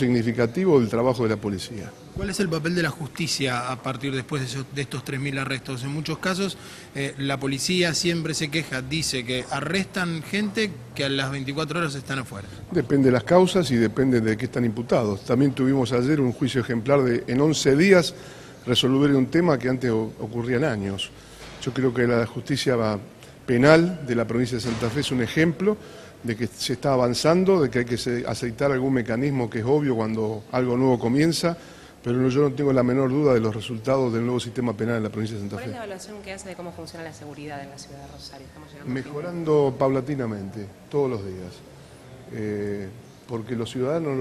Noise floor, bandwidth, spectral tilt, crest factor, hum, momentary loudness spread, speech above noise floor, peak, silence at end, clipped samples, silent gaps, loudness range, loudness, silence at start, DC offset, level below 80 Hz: -45 dBFS; 13.5 kHz; -5.5 dB/octave; 24 dB; none; 16 LU; 21 dB; 0 dBFS; 0 s; under 0.1%; none; 8 LU; -23 LUFS; 0 s; under 0.1%; -52 dBFS